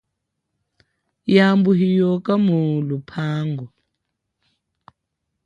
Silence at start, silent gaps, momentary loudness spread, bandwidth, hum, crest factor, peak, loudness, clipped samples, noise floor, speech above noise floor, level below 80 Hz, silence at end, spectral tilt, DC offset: 1.25 s; none; 13 LU; 7.2 kHz; none; 18 dB; -2 dBFS; -18 LUFS; under 0.1%; -78 dBFS; 60 dB; -64 dBFS; 1.8 s; -8.5 dB/octave; under 0.1%